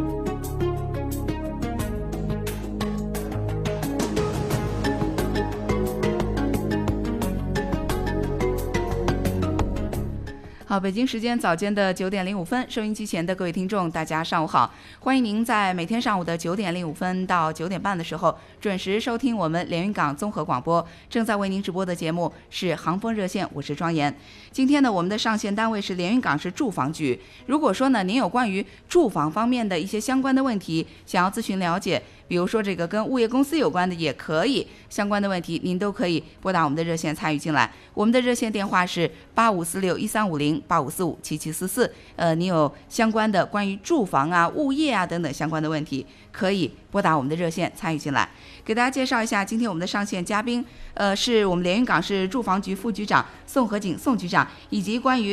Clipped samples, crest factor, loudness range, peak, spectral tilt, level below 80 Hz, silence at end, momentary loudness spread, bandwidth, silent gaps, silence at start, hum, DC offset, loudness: under 0.1%; 20 dB; 3 LU; -4 dBFS; -5.5 dB/octave; -40 dBFS; 0 s; 7 LU; 14.5 kHz; none; 0 s; none; under 0.1%; -24 LUFS